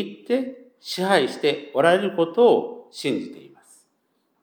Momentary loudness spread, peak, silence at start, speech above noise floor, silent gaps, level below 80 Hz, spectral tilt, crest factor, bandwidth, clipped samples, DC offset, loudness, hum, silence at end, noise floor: 16 LU; -4 dBFS; 0 s; 48 dB; none; -84 dBFS; -5 dB/octave; 20 dB; 19 kHz; under 0.1%; under 0.1%; -22 LUFS; none; 1.05 s; -70 dBFS